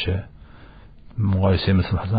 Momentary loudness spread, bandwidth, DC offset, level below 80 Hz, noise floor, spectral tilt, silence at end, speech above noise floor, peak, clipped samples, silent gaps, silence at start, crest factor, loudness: 16 LU; 5 kHz; under 0.1%; -38 dBFS; -44 dBFS; -6.5 dB/octave; 0 s; 24 dB; -8 dBFS; under 0.1%; none; 0 s; 14 dB; -21 LUFS